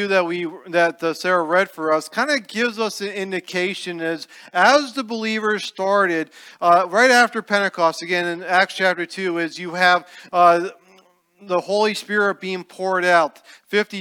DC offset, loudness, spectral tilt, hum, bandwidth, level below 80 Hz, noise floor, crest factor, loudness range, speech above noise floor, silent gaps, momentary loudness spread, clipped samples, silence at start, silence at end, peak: under 0.1%; -19 LUFS; -3.5 dB/octave; none; 18 kHz; -78 dBFS; -55 dBFS; 20 dB; 4 LU; 35 dB; none; 11 LU; under 0.1%; 0 s; 0 s; 0 dBFS